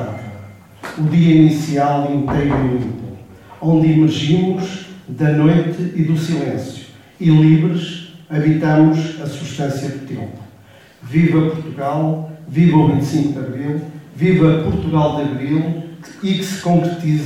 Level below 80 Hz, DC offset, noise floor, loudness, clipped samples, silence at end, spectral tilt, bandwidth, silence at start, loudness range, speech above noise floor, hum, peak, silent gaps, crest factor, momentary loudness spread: -44 dBFS; under 0.1%; -44 dBFS; -16 LUFS; under 0.1%; 0 s; -7.5 dB/octave; 11 kHz; 0 s; 3 LU; 29 dB; none; 0 dBFS; none; 16 dB; 16 LU